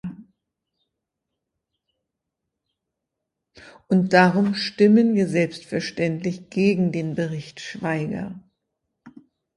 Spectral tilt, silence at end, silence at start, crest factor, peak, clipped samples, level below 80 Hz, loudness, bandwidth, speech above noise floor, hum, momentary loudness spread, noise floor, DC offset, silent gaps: -6.5 dB/octave; 0.45 s; 0.05 s; 24 dB; 0 dBFS; under 0.1%; -64 dBFS; -21 LUFS; 11 kHz; 62 dB; none; 14 LU; -82 dBFS; under 0.1%; none